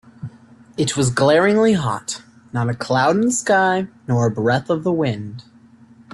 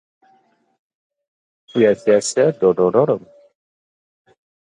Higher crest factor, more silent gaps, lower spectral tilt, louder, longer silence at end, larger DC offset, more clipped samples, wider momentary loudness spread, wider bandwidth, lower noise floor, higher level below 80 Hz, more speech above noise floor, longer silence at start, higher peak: about the same, 16 dB vs 18 dB; neither; about the same, -5 dB/octave vs -5 dB/octave; about the same, -18 LUFS vs -17 LUFS; second, 0.7 s vs 1.5 s; neither; neither; first, 19 LU vs 7 LU; about the same, 12 kHz vs 11 kHz; second, -47 dBFS vs -59 dBFS; first, -54 dBFS vs -62 dBFS; second, 30 dB vs 44 dB; second, 0.2 s vs 1.75 s; about the same, -4 dBFS vs -2 dBFS